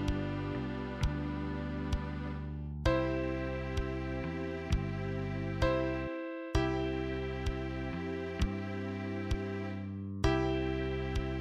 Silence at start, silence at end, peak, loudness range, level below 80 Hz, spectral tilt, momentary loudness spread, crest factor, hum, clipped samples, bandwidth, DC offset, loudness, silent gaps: 0 s; 0 s; -16 dBFS; 1 LU; -40 dBFS; -7 dB/octave; 7 LU; 18 dB; none; under 0.1%; 11 kHz; under 0.1%; -36 LUFS; none